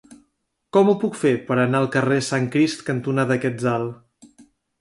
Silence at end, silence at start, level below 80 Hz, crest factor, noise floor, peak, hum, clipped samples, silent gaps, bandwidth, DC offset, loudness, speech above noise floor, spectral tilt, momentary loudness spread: 0.4 s; 0.1 s; -62 dBFS; 16 dB; -72 dBFS; -6 dBFS; none; under 0.1%; none; 11.5 kHz; under 0.1%; -21 LUFS; 52 dB; -6 dB/octave; 5 LU